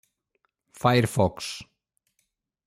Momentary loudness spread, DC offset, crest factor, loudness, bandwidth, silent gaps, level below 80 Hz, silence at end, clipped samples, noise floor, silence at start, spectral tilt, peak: 13 LU; under 0.1%; 20 dB; -25 LUFS; 16 kHz; none; -58 dBFS; 1.05 s; under 0.1%; -76 dBFS; 0.8 s; -5.5 dB/octave; -8 dBFS